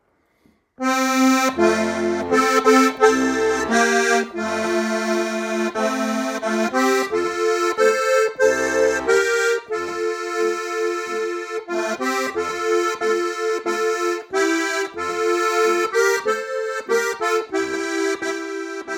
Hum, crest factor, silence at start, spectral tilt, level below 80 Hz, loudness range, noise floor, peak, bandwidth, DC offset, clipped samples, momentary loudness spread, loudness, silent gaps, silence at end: none; 18 dB; 0.8 s; -3 dB/octave; -58 dBFS; 5 LU; -60 dBFS; -2 dBFS; 18 kHz; under 0.1%; under 0.1%; 8 LU; -20 LUFS; none; 0 s